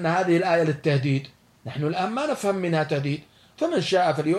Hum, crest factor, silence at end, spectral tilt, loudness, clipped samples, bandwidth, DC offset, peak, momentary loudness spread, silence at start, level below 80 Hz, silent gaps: none; 14 dB; 0 s; -6.5 dB/octave; -24 LUFS; under 0.1%; 13 kHz; under 0.1%; -10 dBFS; 8 LU; 0 s; -68 dBFS; none